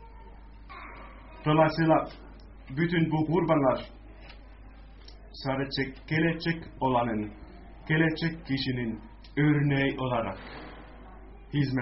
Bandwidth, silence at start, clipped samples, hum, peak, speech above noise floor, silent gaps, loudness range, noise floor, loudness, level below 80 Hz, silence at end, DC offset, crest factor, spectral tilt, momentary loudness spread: 6 kHz; 0 s; under 0.1%; none; -10 dBFS; 21 dB; none; 4 LU; -48 dBFS; -28 LUFS; -48 dBFS; 0 s; under 0.1%; 20 dB; -5.5 dB/octave; 24 LU